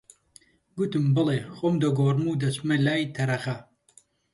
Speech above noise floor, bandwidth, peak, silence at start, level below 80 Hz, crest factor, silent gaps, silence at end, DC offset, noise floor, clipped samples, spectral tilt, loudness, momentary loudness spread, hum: 35 dB; 11.5 kHz; -10 dBFS; 0.75 s; -64 dBFS; 16 dB; none; 0.7 s; under 0.1%; -60 dBFS; under 0.1%; -7 dB/octave; -25 LUFS; 8 LU; none